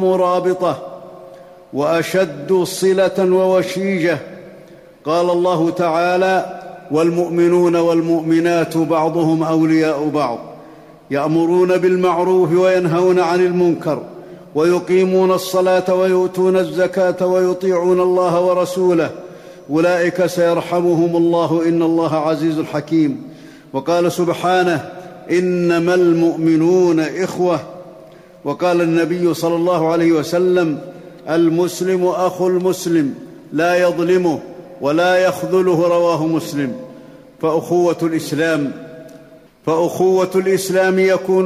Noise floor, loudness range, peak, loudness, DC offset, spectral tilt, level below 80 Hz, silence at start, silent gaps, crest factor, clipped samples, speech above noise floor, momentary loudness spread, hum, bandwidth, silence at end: -42 dBFS; 3 LU; -6 dBFS; -16 LUFS; under 0.1%; -6 dB/octave; -60 dBFS; 0 s; none; 10 dB; under 0.1%; 27 dB; 10 LU; none; 15 kHz; 0 s